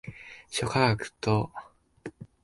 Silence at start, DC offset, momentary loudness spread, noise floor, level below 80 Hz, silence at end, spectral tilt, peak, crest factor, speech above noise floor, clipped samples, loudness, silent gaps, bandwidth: 0.05 s; under 0.1%; 21 LU; -46 dBFS; -56 dBFS; 0.2 s; -5 dB/octave; -8 dBFS; 22 dB; 19 dB; under 0.1%; -28 LUFS; none; 11.5 kHz